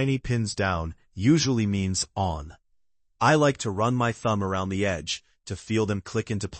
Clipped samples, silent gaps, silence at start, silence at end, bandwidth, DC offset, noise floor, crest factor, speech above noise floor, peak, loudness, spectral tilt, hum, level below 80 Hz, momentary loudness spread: under 0.1%; none; 0 s; 0 s; 8.8 kHz; under 0.1%; -71 dBFS; 18 dB; 46 dB; -8 dBFS; -25 LUFS; -5 dB/octave; none; -50 dBFS; 11 LU